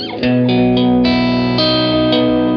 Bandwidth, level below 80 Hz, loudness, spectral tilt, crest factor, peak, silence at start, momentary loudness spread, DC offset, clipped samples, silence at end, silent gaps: 6.2 kHz; -38 dBFS; -13 LUFS; -8 dB/octave; 12 dB; -2 dBFS; 0 s; 2 LU; under 0.1%; under 0.1%; 0 s; none